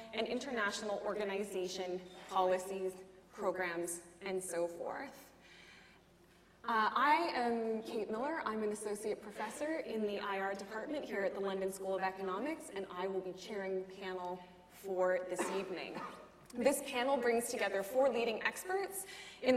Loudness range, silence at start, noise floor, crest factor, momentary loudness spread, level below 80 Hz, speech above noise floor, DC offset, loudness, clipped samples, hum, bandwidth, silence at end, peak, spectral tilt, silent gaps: 5 LU; 0 s; -65 dBFS; 20 dB; 13 LU; -74 dBFS; 27 dB; under 0.1%; -38 LUFS; under 0.1%; none; 16 kHz; 0 s; -18 dBFS; -3.5 dB/octave; none